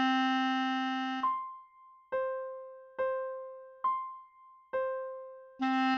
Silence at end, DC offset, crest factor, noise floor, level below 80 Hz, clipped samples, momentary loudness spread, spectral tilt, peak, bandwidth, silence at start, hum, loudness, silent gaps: 0 s; under 0.1%; 14 dB; -58 dBFS; -80 dBFS; under 0.1%; 17 LU; -3.5 dB/octave; -20 dBFS; 7 kHz; 0 s; none; -34 LUFS; none